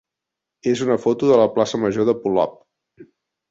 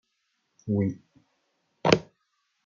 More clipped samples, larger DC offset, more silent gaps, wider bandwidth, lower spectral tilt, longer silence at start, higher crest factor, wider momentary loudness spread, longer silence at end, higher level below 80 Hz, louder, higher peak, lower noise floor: neither; neither; neither; about the same, 8 kHz vs 7.4 kHz; about the same, -6 dB/octave vs -5 dB/octave; about the same, 0.65 s vs 0.65 s; second, 18 dB vs 28 dB; second, 8 LU vs 19 LU; second, 0.45 s vs 0.65 s; about the same, -60 dBFS vs -62 dBFS; first, -19 LUFS vs -27 LUFS; about the same, -2 dBFS vs -2 dBFS; first, -84 dBFS vs -76 dBFS